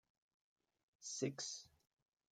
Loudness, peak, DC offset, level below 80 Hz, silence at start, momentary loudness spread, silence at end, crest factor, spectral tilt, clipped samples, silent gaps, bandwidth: -46 LUFS; -26 dBFS; under 0.1%; -90 dBFS; 1 s; 12 LU; 0.65 s; 24 dB; -3.5 dB/octave; under 0.1%; none; 14 kHz